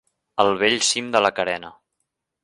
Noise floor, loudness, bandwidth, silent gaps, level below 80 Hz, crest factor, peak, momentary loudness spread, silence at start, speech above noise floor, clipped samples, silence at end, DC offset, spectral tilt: -78 dBFS; -20 LUFS; 11.5 kHz; none; -62 dBFS; 22 dB; -2 dBFS; 10 LU; 0.35 s; 57 dB; under 0.1%; 0.7 s; under 0.1%; -1.5 dB/octave